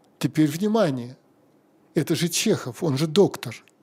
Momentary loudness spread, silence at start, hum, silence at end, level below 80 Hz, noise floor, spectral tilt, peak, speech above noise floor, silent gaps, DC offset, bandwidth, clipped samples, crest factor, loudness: 13 LU; 0.2 s; none; 0.25 s; -68 dBFS; -59 dBFS; -5 dB/octave; -6 dBFS; 37 dB; none; under 0.1%; 16 kHz; under 0.1%; 18 dB; -23 LUFS